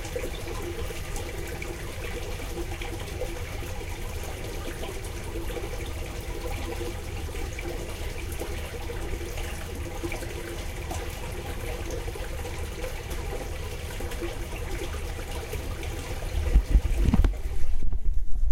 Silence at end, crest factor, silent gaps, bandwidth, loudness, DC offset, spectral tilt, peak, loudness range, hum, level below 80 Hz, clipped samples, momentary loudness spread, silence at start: 0 s; 18 dB; none; 16.5 kHz; -33 LUFS; under 0.1%; -5 dB/octave; -8 dBFS; 6 LU; none; -30 dBFS; under 0.1%; 8 LU; 0 s